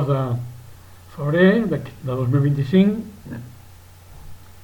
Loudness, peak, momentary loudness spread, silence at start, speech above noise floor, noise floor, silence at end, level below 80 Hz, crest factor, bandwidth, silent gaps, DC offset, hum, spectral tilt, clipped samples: -20 LUFS; -2 dBFS; 20 LU; 0 s; 25 dB; -44 dBFS; 0.05 s; -50 dBFS; 18 dB; 18 kHz; none; under 0.1%; none; -8.5 dB/octave; under 0.1%